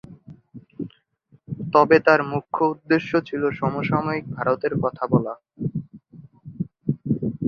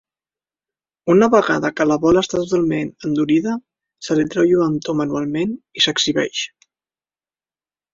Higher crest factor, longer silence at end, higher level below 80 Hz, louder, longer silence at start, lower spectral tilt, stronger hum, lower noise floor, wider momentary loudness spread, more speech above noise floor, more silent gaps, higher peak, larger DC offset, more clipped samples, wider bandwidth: about the same, 22 dB vs 18 dB; second, 0 s vs 1.45 s; about the same, -56 dBFS vs -52 dBFS; second, -22 LUFS vs -18 LUFS; second, 0.1 s vs 1.05 s; first, -8.5 dB/octave vs -4.5 dB/octave; neither; second, -59 dBFS vs under -90 dBFS; first, 18 LU vs 10 LU; second, 38 dB vs over 73 dB; neither; about the same, -2 dBFS vs -2 dBFS; neither; neither; second, 6.8 kHz vs 7.6 kHz